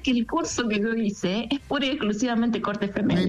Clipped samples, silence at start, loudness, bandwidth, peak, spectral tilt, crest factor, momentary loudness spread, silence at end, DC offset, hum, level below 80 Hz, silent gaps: under 0.1%; 0 s; -25 LUFS; 10 kHz; -14 dBFS; -5 dB/octave; 10 dB; 3 LU; 0 s; under 0.1%; none; -50 dBFS; none